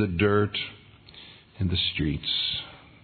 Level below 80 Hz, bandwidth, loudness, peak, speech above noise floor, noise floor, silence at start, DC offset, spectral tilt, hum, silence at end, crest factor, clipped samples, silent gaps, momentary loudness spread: -50 dBFS; 4.6 kHz; -26 LUFS; -8 dBFS; 23 dB; -49 dBFS; 0 s; under 0.1%; -8.5 dB/octave; none; 0.25 s; 20 dB; under 0.1%; none; 23 LU